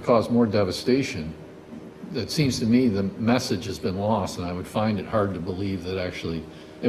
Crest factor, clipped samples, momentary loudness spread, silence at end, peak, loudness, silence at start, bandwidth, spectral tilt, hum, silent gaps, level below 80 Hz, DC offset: 18 dB; under 0.1%; 15 LU; 0 s; -8 dBFS; -25 LUFS; 0 s; 14 kHz; -6 dB/octave; none; none; -54 dBFS; under 0.1%